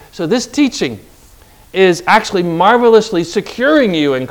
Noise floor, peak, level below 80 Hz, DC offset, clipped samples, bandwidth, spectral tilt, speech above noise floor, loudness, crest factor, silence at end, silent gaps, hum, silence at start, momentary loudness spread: -43 dBFS; 0 dBFS; -46 dBFS; under 0.1%; 0.2%; 18 kHz; -4.5 dB/octave; 30 dB; -13 LUFS; 14 dB; 0 s; none; none; 0.15 s; 10 LU